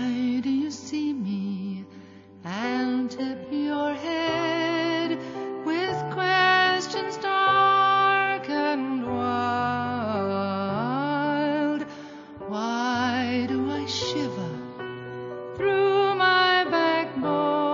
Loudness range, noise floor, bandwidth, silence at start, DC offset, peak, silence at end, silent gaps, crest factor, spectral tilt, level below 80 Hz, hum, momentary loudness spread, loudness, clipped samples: 7 LU; -46 dBFS; 7.6 kHz; 0 s; under 0.1%; -8 dBFS; 0 s; none; 16 dB; -5 dB/octave; -66 dBFS; none; 15 LU; -24 LUFS; under 0.1%